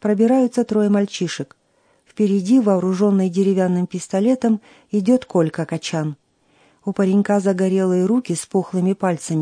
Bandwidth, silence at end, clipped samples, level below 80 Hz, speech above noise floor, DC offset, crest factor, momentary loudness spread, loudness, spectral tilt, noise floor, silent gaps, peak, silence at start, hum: 10.5 kHz; 0 s; under 0.1%; -66 dBFS; 40 dB; under 0.1%; 14 dB; 9 LU; -19 LUFS; -6.5 dB/octave; -58 dBFS; none; -4 dBFS; 0 s; none